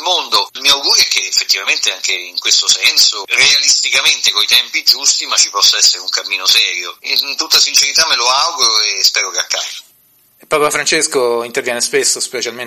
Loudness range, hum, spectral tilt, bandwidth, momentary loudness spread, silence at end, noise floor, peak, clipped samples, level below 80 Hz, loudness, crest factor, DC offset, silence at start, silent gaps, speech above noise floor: 5 LU; none; 1.5 dB/octave; over 20 kHz; 8 LU; 0 s; -51 dBFS; 0 dBFS; under 0.1%; -58 dBFS; -11 LUFS; 14 dB; under 0.1%; 0 s; none; 38 dB